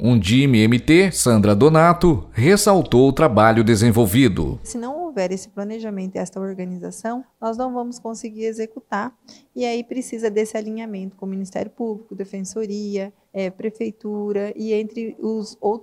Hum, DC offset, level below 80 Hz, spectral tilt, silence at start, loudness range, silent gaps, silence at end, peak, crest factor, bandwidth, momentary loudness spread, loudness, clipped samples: none; under 0.1%; -42 dBFS; -6 dB/octave; 0 s; 13 LU; none; 0 s; 0 dBFS; 20 dB; 16 kHz; 15 LU; -19 LUFS; under 0.1%